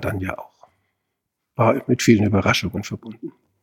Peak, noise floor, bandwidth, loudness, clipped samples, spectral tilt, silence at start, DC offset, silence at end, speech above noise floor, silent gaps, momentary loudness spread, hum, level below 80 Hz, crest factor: -2 dBFS; -78 dBFS; 17 kHz; -19 LUFS; under 0.1%; -5.5 dB/octave; 0 s; under 0.1%; 0.3 s; 59 dB; none; 20 LU; none; -50 dBFS; 20 dB